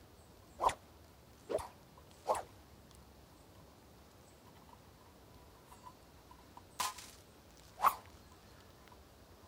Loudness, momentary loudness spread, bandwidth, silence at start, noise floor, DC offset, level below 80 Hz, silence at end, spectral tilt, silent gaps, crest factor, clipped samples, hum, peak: -39 LUFS; 23 LU; 16 kHz; 0.55 s; -60 dBFS; under 0.1%; -66 dBFS; 0 s; -3 dB/octave; none; 30 dB; under 0.1%; none; -16 dBFS